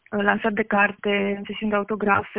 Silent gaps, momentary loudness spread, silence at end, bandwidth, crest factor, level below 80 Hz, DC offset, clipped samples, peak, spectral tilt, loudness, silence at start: none; 5 LU; 0 s; 3.9 kHz; 20 dB; -58 dBFS; under 0.1%; under 0.1%; -4 dBFS; -9.5 dB/octave; -22 LUFS; 0.1 s